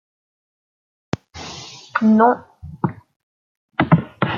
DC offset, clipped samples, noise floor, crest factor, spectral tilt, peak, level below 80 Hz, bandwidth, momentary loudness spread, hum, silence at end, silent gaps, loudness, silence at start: under 0.1%; under 0.1%; -37 dBFS; 20 dB; -7 dB/octave; -2 dBFS; -54 dBFS; 7.4 kHz; 19 LU; none; 0 s; 3.16-3.69 s; -19 LUFS; 1.35 s